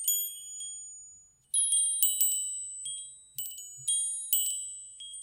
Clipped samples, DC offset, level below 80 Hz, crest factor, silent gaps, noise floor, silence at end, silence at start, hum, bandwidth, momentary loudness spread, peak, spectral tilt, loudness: under 0.1%; under 0.1%; -80 dBFS; 28 dB; none; -56 dBFS; 0 s; 0 s; none; 16.5 kHz; 17 LU; -4 dBFS; 4.5 dB/octave; -28 LUFS